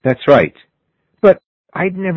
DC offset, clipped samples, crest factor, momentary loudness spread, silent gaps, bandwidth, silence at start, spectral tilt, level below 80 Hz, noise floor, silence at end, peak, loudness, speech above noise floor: under 0.1%; 0.2%; 14 dB; 10 LU; 1.46-1.64 s; 6.2 kHz; 0.05 s; -8.5 dB/octave; -50 dBFS; -67 dBFS; 0 s; 0 dBFS; -14 LUFS; 53 dB